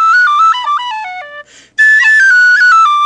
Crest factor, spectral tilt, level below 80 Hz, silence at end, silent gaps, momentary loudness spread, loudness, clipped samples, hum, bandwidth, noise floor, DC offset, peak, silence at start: 8 dB; 3 dB/octave; -66 dBFS; 0 s; none; 17 LU; -6 LUFS; under 0.1%; none; 9.8 kHz; -33 dBFS; under 0.1%; 0 dBFS; 0 s